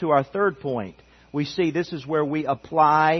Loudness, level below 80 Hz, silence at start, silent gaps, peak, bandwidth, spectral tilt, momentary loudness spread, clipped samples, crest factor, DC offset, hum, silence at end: -24 LUFS; -60 dBFS; 0 s; none; -6 dBFS; 6.4 kHz; -7 dB/octave; 11 LU; under 0.1%; 18 dB; under 0.1%; none; 0 s